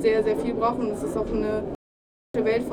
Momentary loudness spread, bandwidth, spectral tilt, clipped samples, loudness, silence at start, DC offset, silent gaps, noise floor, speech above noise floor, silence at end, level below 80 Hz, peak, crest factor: 9 LU; 13.5 kHz; -6.5 dB/octave; under 0.1%; -26 LUFS; 0 s; under 0.1%; 1.75-2.34 s; under -90 dBFS; over 66 dB; 0 s; -44 dBFS; -10 dBFS; 16 dB